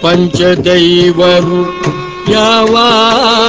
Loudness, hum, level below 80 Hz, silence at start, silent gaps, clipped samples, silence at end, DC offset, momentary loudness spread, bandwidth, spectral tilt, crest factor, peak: -8 LUFS; none; -38 dBFS; 0 s; none; 0.6%; 0 s; under 0.1%; 8 LU; 8 kHz; -5 dB/octave; 8 dB; 0 dBFS